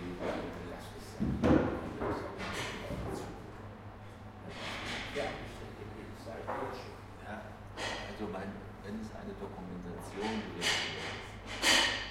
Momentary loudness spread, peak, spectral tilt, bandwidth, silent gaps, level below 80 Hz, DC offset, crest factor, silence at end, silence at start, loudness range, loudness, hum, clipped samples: 18 LU; -14 dBFS; -3.5 dB/octave; 16.5 kHz; none; -52 dBFS; under 0.1%; 24 dB; 0 s; 0 s; 7 LU; -36 LUFS; none; under 0.1%